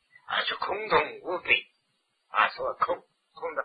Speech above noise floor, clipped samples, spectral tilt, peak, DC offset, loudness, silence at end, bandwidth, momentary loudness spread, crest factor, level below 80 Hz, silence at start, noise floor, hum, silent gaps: 47 dB; under 0.1%; -5.5 dB/octave; -8 dBFS; under 0.1%; -28 LUFS; 0 s; 5 kHz; 9 LU; 22 dB; -66 dBFS; 0.3 s; -75 dBFS; none; none